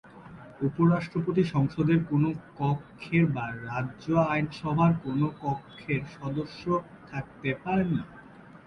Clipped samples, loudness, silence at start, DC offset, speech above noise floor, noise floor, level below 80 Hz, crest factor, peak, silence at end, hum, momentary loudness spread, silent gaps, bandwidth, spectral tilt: under 0.1%; -28 LUFS; 0.05 s; under 0.1%; 22 dB; -49 dBFS; -56 dBFS; 16 dB; -12 dBFS; 0.1 s; none; 10 LU; none; 6.6 kHz; -9 dB/octave